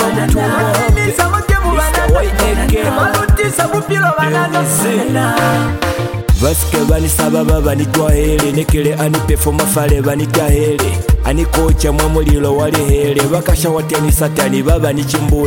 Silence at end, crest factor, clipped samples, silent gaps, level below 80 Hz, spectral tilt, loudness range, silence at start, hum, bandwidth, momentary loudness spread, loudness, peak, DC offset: 0 s; 12 dB; under 0.1%; none; -18 dBFS; -5 dB/octave; 1 LU; 0 s; none; 17 kHz; 2 LU; -13 LUFS; 0 dBFS; under 0.1%